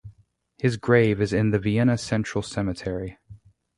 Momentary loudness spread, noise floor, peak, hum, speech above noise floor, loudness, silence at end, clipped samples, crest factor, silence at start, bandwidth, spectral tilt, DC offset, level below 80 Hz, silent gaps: 11 LU; -59 dBFS; -4 dBFS; none; 36 dB; -24 LUFS; 0.4 s; under 0.1%; 20 dB; 0.05 s; 11.5 kHz; -7 dB/octave; under 0.1%; -48 dBFS; none